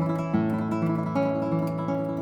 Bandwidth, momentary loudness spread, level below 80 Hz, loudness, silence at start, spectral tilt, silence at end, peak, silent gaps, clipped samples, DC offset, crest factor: 7.8 kHz; 2 LU; -58 dBFS; -27 LUFS; 0 s; -9.5 dB/octave; 0 s; -12 dBFS; none; under 0.1%; under 0.1%; 14 dB